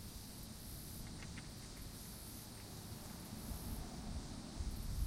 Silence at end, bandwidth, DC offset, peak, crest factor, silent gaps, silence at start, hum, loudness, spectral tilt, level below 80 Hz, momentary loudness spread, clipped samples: 0 s; 16 kHz; under 0.1%; -30 dBFS; 18 dB; none; 0 s; none; -49 LUFS; -4.5 dB/octave; -50 dBFS; 4 LU; under 0.1%